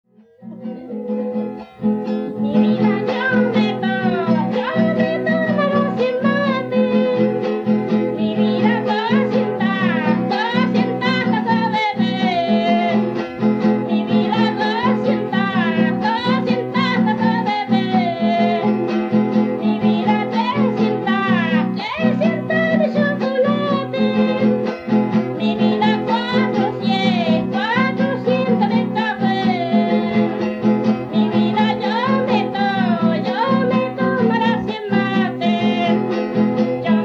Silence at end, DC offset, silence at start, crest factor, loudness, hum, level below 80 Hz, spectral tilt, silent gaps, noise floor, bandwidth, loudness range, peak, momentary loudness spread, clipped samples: 0 s; under 0.1%; 0.4 s; 14 dB; -18 LUFS; none; -58 dBFS; -7.5 dB/octave; none; -39 dBFS; 6.4 kHz; 0 LU; -4 dBFS; 3 LU; under 0.1%